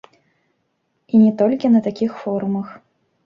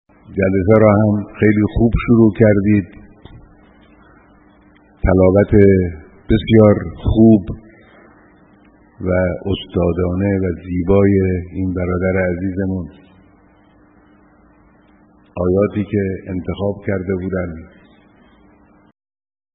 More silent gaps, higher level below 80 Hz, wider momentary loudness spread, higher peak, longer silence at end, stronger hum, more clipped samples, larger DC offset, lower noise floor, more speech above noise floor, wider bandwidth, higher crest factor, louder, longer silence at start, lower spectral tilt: neither; second, -64 dBFS vs -32 dBFS; second, 10 LU vs 14 LU; second, -4 dBFS vs 0 dBFS; second, 0.5 s vs 1.9 s; neither; neither; neither; first, -69 dBFS vs -50 dBFS; first, 53 dB vs 35 dB; first, 5.8 kHz vs 4 kHz; about the same, 14 dB vs 16 dB; second, -18 LUFS vs -15 LUFS; first, 1.15 s vs 0.3 s; first, -9.5 dB/octave vs -8 dB/octave